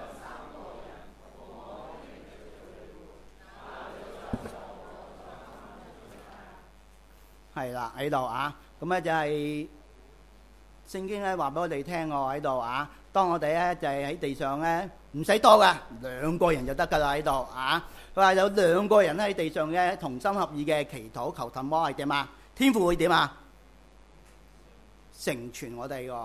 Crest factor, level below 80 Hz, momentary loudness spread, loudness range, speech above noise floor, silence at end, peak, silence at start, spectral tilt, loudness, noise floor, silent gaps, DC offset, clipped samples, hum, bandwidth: 26 dB; -52 dBFS; 23 LU; 20 LU; 28 dB; 0 s; -4 dBFS; 0 s; -5 dB/octave; -27 LUFS; -55 dBFS; none; under 0.1%; under 0.1%; none; 15 kHz